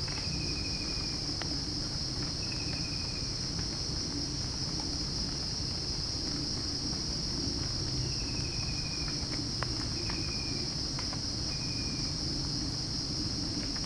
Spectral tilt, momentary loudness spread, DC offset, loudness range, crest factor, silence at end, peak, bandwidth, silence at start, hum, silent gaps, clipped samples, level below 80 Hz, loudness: -3.5 dB/octave; 1 LU; under 0.1%; 1 LU; 20 dB; 0 s; -14 dBFS; 10.5 kHz; 0 s; none; none; under 0.1%; -44 dBFS; -33 LUFS